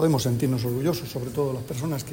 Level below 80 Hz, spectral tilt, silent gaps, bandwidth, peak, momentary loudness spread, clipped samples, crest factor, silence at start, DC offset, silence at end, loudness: -52 dBFS; -6.5 dB/octave; none; 16.5 kHz; -10 dBFS; 7 LU; under 0.1%; 16 dB; 0 s; under 0.1%; 0 s; -26 LUFS